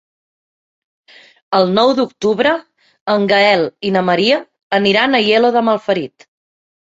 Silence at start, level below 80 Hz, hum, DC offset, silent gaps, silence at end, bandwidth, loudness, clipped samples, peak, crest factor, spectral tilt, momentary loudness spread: 1.5 s; -60 dBFS; none; under 0.1%; 3.01-3.06 s, 4.63-4.70 s; 0.85 s; 8 kHz; -14 LUFS; under 0.1%; 0 dBFS; 14 dB; -5.5 dB/octave; 8 LU